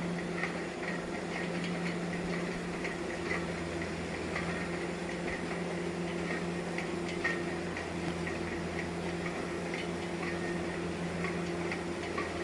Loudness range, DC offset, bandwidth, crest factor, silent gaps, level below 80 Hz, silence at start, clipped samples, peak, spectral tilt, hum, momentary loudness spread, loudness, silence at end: 1 LU; under 0.1%; 11.5 kHz; 18 dB; none; -58 dBFS; 0 s; under 0.1%; -18 dBFS; -5.5 dB/octave; none; 2 LU; -36 LUFS; 0 s